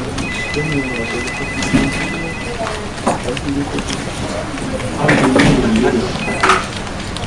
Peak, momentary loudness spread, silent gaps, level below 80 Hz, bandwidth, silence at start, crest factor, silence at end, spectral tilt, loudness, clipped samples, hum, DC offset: 0 dBFS; 10 LU; none; -30 dBFS; 11.5 kHz; 0 s; 16 dB; 0 s; -5 dB/octave; -17 LUFS; under 0.1%; none; under 0.1%